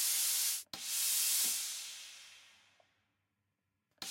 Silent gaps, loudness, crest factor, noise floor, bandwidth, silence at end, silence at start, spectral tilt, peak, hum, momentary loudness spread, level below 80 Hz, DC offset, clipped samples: none; -32 LUFS; 18 dB; -85 dBFS; 16.5 kHz; 0 s; 0 s; 3.5 dB/octave; -20 dBFS; none; 18 LU; -90 dBFS; under 0.1%; under 0.1%